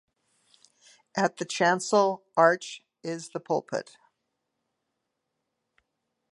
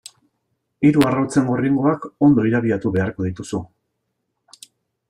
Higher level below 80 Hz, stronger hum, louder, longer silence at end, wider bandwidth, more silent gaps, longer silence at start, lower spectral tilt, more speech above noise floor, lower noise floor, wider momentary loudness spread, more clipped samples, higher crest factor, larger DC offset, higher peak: second, -84 dBFS vs -54 dBFS; neither; second, -27 LUFS vs -19 LUFS; first, 2.5 s vs 1.45 s; second, 11.5 kHz vs 15.5 kHz; neither; first, 1.15 s vs 0.8 s; second, -4 dB/octave vs -7 dB/octave; about the same, 56 dB vs 57 dB; first, -82 dBFS vs -75 dBFS; first, 14 LU vs 11 LU; neither; first, 24 dB vs 18 dB; neither; second, -6 dBFS vs -2 dBFS